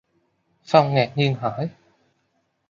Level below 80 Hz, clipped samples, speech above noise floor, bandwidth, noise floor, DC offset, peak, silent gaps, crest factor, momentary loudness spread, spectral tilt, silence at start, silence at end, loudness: -64 dBFS; under 0.1%; 50 dB; 7.4 kHz; -70 dBFS; under 0.1%; -2 dBFS; none; 22 dB; 12 LU; -7 dB/octave; 0.7 s; 1 s; -21 LUFS